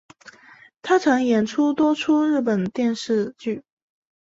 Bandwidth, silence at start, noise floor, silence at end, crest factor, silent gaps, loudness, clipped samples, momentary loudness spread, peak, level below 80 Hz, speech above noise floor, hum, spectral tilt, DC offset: 8 kHz; 0.25 s; -50 dBFS; 0.65 s; 16 dB; none; -21 LUFS; under 0.1%; 11 LU; -6 dBFS; -64 dBFS; 30 dB; none; -5.5 dB/octave; under 0.1%